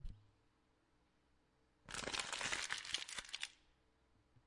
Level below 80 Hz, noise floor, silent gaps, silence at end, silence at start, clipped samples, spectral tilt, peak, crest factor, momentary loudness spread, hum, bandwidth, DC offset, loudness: -64 dBFS; -78 dBFS; none; 0.9 s; 0 s; under 0.1%; -0.5 dB/octave; -22 dBFS; 26 dB; 9 LU; none; 11.5 kHz; under 0.1%; -44 LUFS